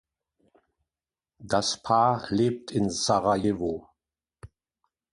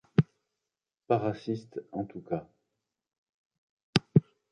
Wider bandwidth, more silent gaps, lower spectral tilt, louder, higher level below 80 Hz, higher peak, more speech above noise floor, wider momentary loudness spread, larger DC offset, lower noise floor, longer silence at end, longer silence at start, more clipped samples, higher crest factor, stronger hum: about the same, 11.5 kHz vs 10.5 kHz; second, none vs 3.18-3.50 s, 3.58-3.77 s, 3.83-3.93 s; second, -5 dB/octave vs -7 dB/octave; first, -26 LUFS vs -31 LUFS; first, -56 dBFS vs -64 dBFS; second, -10 dBFS vs -2 dBFS; first, over 65 dB vs 57 dB; second, 7 LU vs 12 LU; neither; about the same, under -90 dBFS vs -89 dBFS; first, 0.65 s vs 0.3 s; first, 1.4 s vs 0.2 s; neither; second, 20 dB vs 30 dB; neither